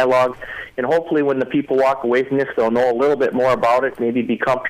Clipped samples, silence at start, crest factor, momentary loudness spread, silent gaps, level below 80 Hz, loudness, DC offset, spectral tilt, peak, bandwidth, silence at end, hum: under 0.1%; 0 s; 10 dB; 5 LU; none; -54 dBFS; -18 LUFS; under 0.1%; -6.5 dB/octave; -6 dBFS; 14.5 kHz; 0 s; none